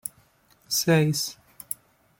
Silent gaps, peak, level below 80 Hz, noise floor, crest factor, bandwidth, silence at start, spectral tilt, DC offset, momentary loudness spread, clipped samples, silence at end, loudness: none; -8 dBFS; -64 dBFS; -61 dBFS; 20 dB; 17 kHz; 0.05 s; -4 dB/octave; under 0.1%; 16 LU; under 0.1%; 0.85 s; -25 LUFS